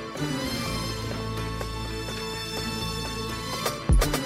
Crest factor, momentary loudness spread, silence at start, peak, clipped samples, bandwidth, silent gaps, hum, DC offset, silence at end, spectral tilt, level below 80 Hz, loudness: 16 dB; 7 LU; 0 s; -12 dBFS; under 0.1%; 16 kHz; none; none; under 0.1%; 0 s; -4.5 dB/octave; -32 dBFS; -29 LUFS